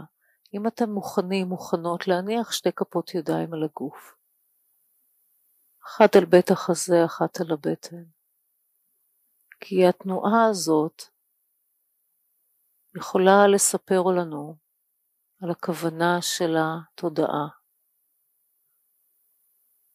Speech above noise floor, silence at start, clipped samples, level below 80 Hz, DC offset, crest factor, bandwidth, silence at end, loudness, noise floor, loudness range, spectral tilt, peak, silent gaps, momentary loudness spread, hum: 51 dB; 0 s; under 0.1%; -76 dBFS; under 0.1%; 22 dB; 15.5 kHz; 2.45 s; -23 LUFS; -73 dBFS; 7 LU; -4.5 dB/octave; -4 dBFS; none; 19 LU; none